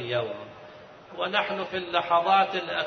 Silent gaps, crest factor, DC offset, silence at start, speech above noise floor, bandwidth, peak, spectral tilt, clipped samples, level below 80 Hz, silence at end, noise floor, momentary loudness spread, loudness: none; 18 dB; under 0.1%; 0 s; 21 dB; 6.4 kHz; -8 dBFS; -5 dB/octave; under 0.1%; -68 dBFS; 0 s; -47 dBFS; 22 LU; -26 LUFS